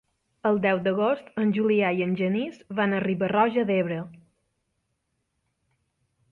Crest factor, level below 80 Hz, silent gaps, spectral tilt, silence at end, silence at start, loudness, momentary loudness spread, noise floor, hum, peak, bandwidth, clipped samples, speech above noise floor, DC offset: 18 dB; -68 dBFS; none; -9 dB/octave; 2.15 s; 0.45 s; -25 LUFS; 7 LU; -77 dBFS; none; -8 dBFS; 4.4 kHz; under 0.1%; 52 dB; under 0.1%